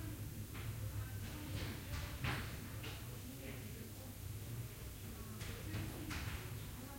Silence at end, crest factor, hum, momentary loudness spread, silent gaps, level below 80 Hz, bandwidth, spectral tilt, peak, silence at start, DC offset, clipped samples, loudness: 0 s; 18 dB; none; 6 LU; none; -54 dBFS; 16.5 kHz; -4.5 dB/octave; -28 dBFS; 0 s; under 0.1%; under 0.1%; -47 LUFS